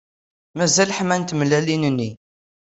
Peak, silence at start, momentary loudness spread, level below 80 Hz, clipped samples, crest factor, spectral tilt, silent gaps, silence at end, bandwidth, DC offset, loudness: -4 dBFS; 0.55 s; 10 LU; -58 dBFS; under 0.1%; 18 dB; -4 dB/octave; none; 0.6 s; 8.4 kHz; under 0.1%; -19 LUFS